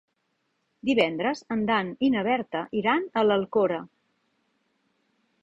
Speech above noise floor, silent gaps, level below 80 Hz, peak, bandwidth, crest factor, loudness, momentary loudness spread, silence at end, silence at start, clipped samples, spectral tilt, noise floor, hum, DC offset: 50 dB; none; -66 dBFS; -8 dBFS; 7.8 kHz; 18 dB; -25 LUFS; 6 LU; 1.55 s; 0.85 s; under 0.1%; -6 dB/octave; -75 dBFS; none; under 0.1%